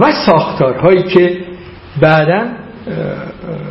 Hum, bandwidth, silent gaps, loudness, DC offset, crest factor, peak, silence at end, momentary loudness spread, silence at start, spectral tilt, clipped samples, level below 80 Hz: none; 5.8 kHz; none; -12 LUFS; under 0.1%; 12 dB; 0 dBFS; 0 s; 17 LU; 0 s; -9 dB/octave; 0.2%; -42 dBFS